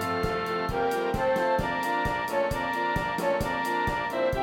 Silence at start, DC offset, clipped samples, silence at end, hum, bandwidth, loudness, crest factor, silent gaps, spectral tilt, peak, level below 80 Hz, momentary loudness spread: 0 s; under 0.1%; under 0.1%; 0 s; none; 17 kHz; -27 LUFS; 14 dB; none; -5.5 dB/octave; -14 dBFS; -44 dBFS; 2 LU